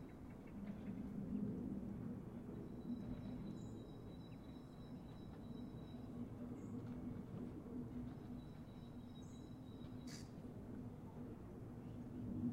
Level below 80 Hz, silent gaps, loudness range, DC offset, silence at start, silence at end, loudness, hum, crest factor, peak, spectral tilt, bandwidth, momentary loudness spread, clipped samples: -64 dBFS; none; 5 LU; under 0.1%; 0 s; 0 s; -52 LUFS; none; 18 dB; -34 dBFS; -8 dB/octave; 16 kHz; 8 LU; under 0.1%